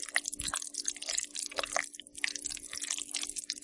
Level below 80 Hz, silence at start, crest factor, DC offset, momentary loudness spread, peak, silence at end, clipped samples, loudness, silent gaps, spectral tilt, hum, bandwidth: -64 dBFS; 0 s; 28 dB; under 0.1%; 4 LU; -10 dBFS; 0 s; under 0.1%; -35 LUFS; none; 1 dB/octave; none; 11.5 kHz